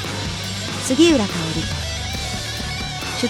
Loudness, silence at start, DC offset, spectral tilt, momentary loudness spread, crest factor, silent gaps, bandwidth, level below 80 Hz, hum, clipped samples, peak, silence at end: -21 LUFS; 0 s; under 0.1%; -4 dB/octave; 10 LU; 18 dB; none; 17.5 kHz; -36 dBFS; none; under 0.1%; -2 dBFS; 0 s